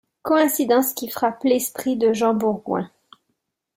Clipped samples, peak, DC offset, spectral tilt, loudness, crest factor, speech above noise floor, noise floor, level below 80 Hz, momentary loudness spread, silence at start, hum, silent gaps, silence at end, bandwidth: under 0.1%; -6 dBFS; under 0.1%; -4 dB/octave; -21 LUFS; 16 dB; 55 dB; -75 dBFS; -66 dBFS; 8 LU; 0.25 s; none; none; 0.9 s; 16 kHz